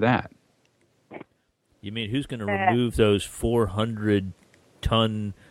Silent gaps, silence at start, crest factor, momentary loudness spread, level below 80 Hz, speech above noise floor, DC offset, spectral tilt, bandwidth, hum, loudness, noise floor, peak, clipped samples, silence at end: none; 0 s; 20 dB; 22 LU; -42 dBFS; 44 dB; under 0.1%; -6 dB/octave; 15.5 kHz; none; -25 LUFS; -68 dBFS; -6 dBFS; under 0.1%; 0.15 s